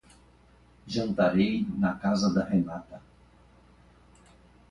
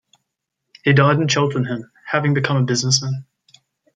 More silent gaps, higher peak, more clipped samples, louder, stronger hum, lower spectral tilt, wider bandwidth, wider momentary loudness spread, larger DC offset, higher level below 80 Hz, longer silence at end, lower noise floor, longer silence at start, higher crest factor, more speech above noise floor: neither; second, -10 dBFS vs 0 dBFS; neither; second, -27 LUFS vs -18 LUFS; first, 60 Hz at -50 dBFS vs none; first, -6.5 dB/octave vs -4.5 dB/octave; about the same, 10 kHz vs 9.4 kHz; first, 15 LU vs 12 LU; neither; about the same, -56 dBFS vs -60 dBFS; first, 1.7 s vs 0.75 s; second, -58 dBFS vs -78 dBFS; about the same, 0.85 s vs 0.85 s; about the same, 20 dB vs 18 dB; second, 32 dB vs 61 dB